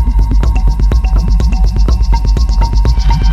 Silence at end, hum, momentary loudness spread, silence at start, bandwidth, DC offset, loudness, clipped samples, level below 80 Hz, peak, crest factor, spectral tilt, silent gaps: 0 s; none; 1 LU; 0 s; 7.2 kHz; under 0.1%; -13 LUFS; under 0.1%; -8 dBFS; 0 dBFS; 8 dB; -7 dB/octave; none